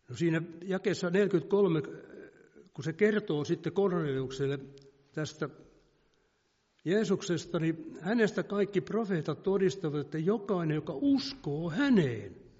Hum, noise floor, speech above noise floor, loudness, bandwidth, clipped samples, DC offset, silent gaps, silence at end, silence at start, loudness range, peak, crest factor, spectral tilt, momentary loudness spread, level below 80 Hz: none; -74 dBFS; 44 dB; -31 LUFS; 7.6 kHz; under 0.1%; under 0.1%; none; 0.2 s; 0.1 s; 5 LU; -14 dBFS; 18 dB; -6 dB/octave; 12 LU; -66 dBFS